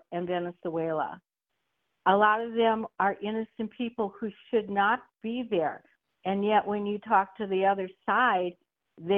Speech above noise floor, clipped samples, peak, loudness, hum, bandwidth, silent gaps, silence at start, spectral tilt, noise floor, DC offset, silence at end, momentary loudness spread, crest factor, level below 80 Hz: 54 dB; under 0.1%; -10 dBFS; -28 LUFS; none; 4.1 kHz; none; 0.1 s; -8.5 dB/octave; -82 dBFS; under 0.1%; 0 s; 11 LU; 20 dB; -72 dBFS